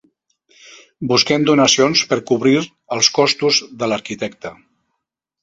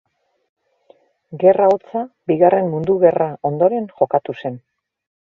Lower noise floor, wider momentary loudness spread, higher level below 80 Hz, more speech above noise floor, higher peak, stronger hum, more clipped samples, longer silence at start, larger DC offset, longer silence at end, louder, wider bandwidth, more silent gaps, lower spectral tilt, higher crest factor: first, -78 dBFS vs -54 dBFS; about the same, 14 LU vs 14 LU; about the same, -58 dBFS vs -60 dBFS; first, 61 dB vs 38 dB; about the same, 0 dBFS vs 0 dBFS; neither; neither; second, 1 s vs 1.3 s; neither; first, 0.9 s vs 0.65 s; about the same, -15 LUFS vs -17 LUFS; first, 8 kHz vs 4.1 kHz; neither; second, -3 dB/octave vs -9.5 dB/octave; about the same, 18 dB vs 18 dB